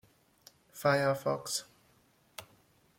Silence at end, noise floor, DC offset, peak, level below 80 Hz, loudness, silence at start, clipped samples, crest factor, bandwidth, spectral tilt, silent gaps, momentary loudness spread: 0.55 s; -68 dBFS; under 0.1%; -14 dBFS; -72 dBFS; -32 LUFS; 0.75 s; under 0.1%; 22 dB; 16.5 kHz; -4 dB/octave; none; 22 LU